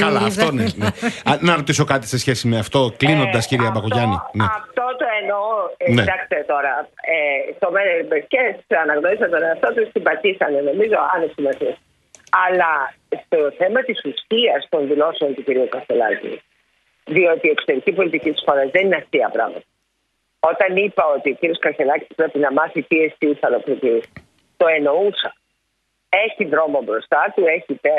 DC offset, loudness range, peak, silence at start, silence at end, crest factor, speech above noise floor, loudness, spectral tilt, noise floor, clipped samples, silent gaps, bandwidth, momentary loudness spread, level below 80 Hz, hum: under 0.1%; 2 LU; 0 dBFS; 0 s; 0 s; 18 dB; 52 dB; -18 LUFS; -5 dB/octave; -70 dBFS; under 0.1%; none; 12 kHz; 5 LU; -54 dBFS; none